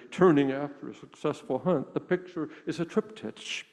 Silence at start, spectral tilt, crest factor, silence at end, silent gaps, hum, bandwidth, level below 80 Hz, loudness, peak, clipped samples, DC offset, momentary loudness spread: 0.05 s; -6.5 dB/octave; 20 dB; 0.1 s; none; none; 10.5 kHz; -70 dBFS; -29 LUFS; -8 dBFS; under 0.1%; under 0.1%; 16 LU